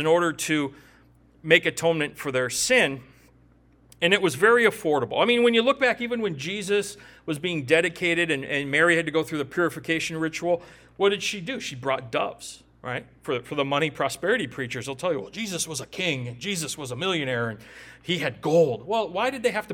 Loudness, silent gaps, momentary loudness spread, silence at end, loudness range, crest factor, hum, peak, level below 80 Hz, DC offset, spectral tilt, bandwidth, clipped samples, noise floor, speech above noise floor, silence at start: -24 LUFS; none; 12 LU; 0 s; 6 LU; 24 dB; none; -2 dBFS; -60 dBFS; under 0.1%; -3.5 dB/octave; 18.5 kHz; under 0.1%; -57 dBFS; 32 dB; 0 s